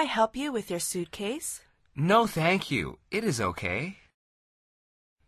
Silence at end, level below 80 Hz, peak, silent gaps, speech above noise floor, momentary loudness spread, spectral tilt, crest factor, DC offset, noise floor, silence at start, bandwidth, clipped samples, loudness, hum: 1.35 s; -56 dBFS; -10 dBFS; none; over 62 dB; 12 LU; -4.5 dB/octave; 20 dB; under 0.1%; under -90 dBFS; 0 s; 13.5 kHz; under 0.1%; -28 LUFS; none